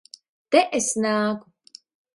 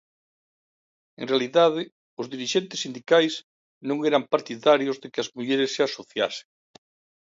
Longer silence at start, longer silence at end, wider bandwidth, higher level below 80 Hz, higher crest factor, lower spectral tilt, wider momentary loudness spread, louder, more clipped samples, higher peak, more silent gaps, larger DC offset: second, 0.5 s vs 1.2 s; about the same, 0.75 s vs 0.8 s; first, 11.5 kHz vs 7.8 kHz; first, -70 dBFS vs -76 dBFS; about the same, 22 dB vs 20 dB; about the same, -3 dB/octave vs -4 dB/octave; second, 7 LU vs 15 LU; about the same, -22 LUFS vs -24 LUFS; neither; first, -2 dBFS vs -6 dBFS; second, none vs 1.92-2.17 s, 3.44-3.81 s; neither